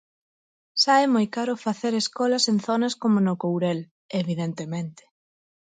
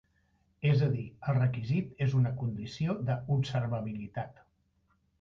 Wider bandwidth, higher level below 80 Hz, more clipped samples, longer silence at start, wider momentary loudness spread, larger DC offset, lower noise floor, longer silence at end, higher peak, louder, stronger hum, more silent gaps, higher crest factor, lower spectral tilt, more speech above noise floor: first, 9.4 kHz vs 7.2 kHz; second, -72 dBFS vs -60 dBFS; neither; first, 0.75 s vs 0.6 s; about the same, 12 LU vs 10 LU; neither; first, under -90 dBFS vs -73 dBFS; second, 0.75 s vs 0.9 s; first, -8 dBFS vs -16 dBFS; first, -24 LUFS vs -32 LUFS; neither; first, 3.91-4.09 s vs none; about the same, 18 dB vs 16 dB; second, -5 dB/octave vs -8.5 dB/octave; first, over 67 dB vs 42 dB